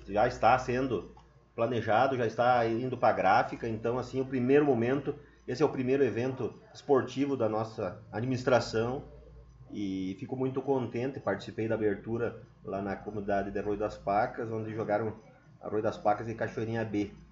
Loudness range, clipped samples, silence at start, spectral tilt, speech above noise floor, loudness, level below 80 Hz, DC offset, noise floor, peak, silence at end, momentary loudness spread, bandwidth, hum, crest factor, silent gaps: 5 LU; under 0.1%; 0 s; -5.5 dB/octave; 22 dB; -31 LUFS; -58 dBFS; under 0.1%; -52 dBFS; -10 dBFS; 0.05 s; 11 LU; 7.8 kHz; none; 20 dB; none